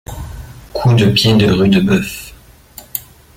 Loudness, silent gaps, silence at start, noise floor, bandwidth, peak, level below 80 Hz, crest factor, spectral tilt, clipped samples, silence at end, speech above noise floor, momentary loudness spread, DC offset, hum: -12 LUFS; none; 0.1 s; -41 dBFS; 17 kHz; -2 dBFS; -36 dBFS; 14 dB; -6 dB/octave; under 0.1%; 0.35 s; 29 dB; 20 LU; under 0.1%; none